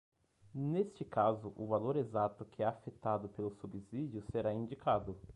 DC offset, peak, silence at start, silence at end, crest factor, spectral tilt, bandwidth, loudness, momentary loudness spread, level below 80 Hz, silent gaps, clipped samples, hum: under 0.1%; -18 dBFS; 0.55 s; 0.05 s; 20 dB; -9 dB/octave; 10.5 kHz; -38 LUFS; 9 LU; -64 dBFS; none; under 0.1%; none